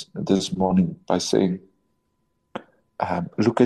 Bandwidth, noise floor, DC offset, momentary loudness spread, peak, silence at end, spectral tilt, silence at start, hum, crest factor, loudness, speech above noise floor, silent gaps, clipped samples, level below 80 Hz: 12 kHz; -71 dBFS; under 0.1%; 18 LU; -4 dBFS; 0 s; -6 dB/octave; 0 s; none; 20 dB; -23 LUFS; 50 dB; none; under 0.1%; -58 dBFS